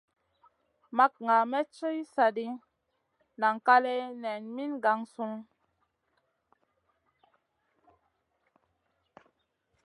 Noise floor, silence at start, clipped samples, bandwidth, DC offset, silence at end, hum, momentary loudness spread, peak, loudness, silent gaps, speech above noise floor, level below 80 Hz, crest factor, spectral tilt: -79 dBFS; 0.9 s; under 0.1%; 11.5 kHz; under 0.1%; 4.4 s; none; 14 LU; -8 dBFS; -29 LUFS; none; 51 dB; -88 dBFS; 24 dB; -5 dB/octave